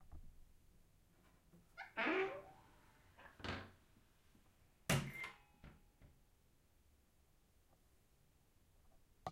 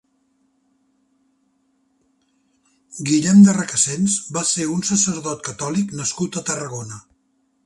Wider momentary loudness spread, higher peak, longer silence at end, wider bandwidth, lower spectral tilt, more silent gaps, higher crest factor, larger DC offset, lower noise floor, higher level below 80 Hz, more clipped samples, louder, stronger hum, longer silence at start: first, 24 LU vs 17 LU; second, -22 dBFS vs -2 dBFS; second, 0 s vs 0.65 s; first, 16 kHz vs 11.5 kHz; about the same, -4.5 dB/octave vs -4 dB/octave; neither; first, 28 dB vs 20 dB; neither; first, -73 dBFS vs -66 dBFS; second, -68 dBFS vs -60 dBFS; neither; second, -44 LUFS vs -18 LUFS; neither; second, 0 s vs 2.9 s